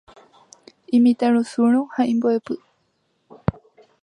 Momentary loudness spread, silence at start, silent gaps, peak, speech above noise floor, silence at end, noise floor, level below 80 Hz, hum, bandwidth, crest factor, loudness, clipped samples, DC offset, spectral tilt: 11 LU; 0.9 s; none; -4 dBFS; 50 dB; 0.5 s; -68 dBFS; -50 dBFS; none; 10 kHz; 18 dB; -20 LUFS; under 0.1%; under 0.1%; -7.5 dB/octave